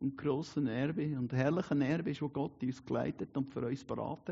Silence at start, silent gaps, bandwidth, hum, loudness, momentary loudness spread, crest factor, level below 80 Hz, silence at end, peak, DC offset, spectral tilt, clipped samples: 0 s; none; 7.6 kHz; none; -36 LUFS; 6 LU; 18 dB; -68 dBFS; 0 s; -18 dBFS; under 0.1%; -7 dB/octave; under 0.1%